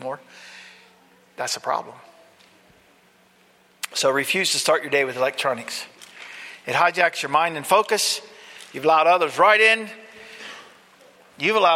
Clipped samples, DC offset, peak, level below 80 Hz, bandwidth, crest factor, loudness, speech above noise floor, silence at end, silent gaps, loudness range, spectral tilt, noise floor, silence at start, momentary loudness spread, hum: under 0.1%; under 0.1%; -2 dBFS; -72 dBFS; 16.5 kHz; 20 dB; -20 LUFS; 36 dB; 0 s; none; 13 LU; -1.5 dB/octave; -57 dBFS; 0 s; 24 LU; none